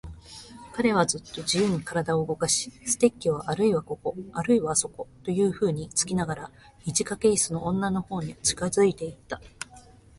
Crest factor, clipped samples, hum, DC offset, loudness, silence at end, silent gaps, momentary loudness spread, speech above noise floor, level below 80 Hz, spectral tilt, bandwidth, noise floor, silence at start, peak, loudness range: 20 dB; under 0.1%; none; under 0.1%; -26 LUFS; 0.4 s; none; 16 LU; 25 dB; -54 dBFS; -4 dB/octave; 11.5 kHz; -51 dBFS; 0.05 s; -6 dBFS; 1 LU